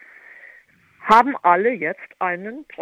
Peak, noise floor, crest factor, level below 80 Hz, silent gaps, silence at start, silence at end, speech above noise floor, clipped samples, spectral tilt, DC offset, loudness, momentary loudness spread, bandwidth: -2 dBFS; -52 dBFS; 20 dB; -58 dBFS; none; 1.05 s; 0 s; 34 dB; under 0.1%; -5.5 dB/octave; under 0.1%; -18 LUFS; 15 LU; 13 kHz